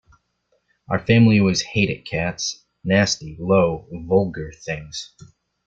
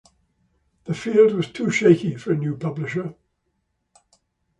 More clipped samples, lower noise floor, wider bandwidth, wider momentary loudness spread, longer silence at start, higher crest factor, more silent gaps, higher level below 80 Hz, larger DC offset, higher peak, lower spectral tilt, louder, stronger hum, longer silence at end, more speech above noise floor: neither; second, -68 dBFS vs -73 dBFS; second, 7.8 kHz vs 9.4 kHz; first, 17 LU vs 14 LU; about the same, 0.9 s vs 0.85 s; about the same, 18 dB vs 20 dB; neither; first, -50 dBFS vs -62 dBFS; neither; about the same, -4 dBFS vs -2 dBFS; second, -5.5 dB/octave vs -7 dB/octave; about the same, -20 LUFS vs -21 LUFS; neither; second, 0.4 s vs 1.45 s; second, 49 dB vs 53 dB